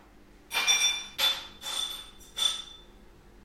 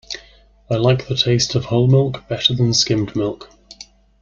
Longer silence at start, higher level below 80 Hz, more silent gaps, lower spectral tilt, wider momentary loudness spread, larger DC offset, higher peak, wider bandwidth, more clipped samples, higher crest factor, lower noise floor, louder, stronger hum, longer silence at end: about the same, 0.2 s vs 0.1 s; second, -58 dBFS vs -46 dBFS; neither; second, 2 dB/octave vs -5 dB/octave; first, 16 LU vs 10 LU; neither; second, -12 dBFS vs -2 dBFS; first, 16 kHz vs 7.4 kHz; neither; about the same, 20 dB vs 18 dB; first, -54 dBFS vs -49 dBFS; second, -27 LUFS vs -17 LUFS; neither; second, 0.15 s vs 0.4 s